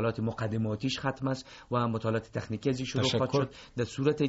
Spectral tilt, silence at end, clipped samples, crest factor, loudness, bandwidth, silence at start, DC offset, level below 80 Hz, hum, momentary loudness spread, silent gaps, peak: -5.5 dB/octave; 0 s; under 0.1%; 18 dB; -31 LUFS; 8 kHz; 0 s; under 0.1%; -58 dBFS; none; 7 LU; none; -14 dBFS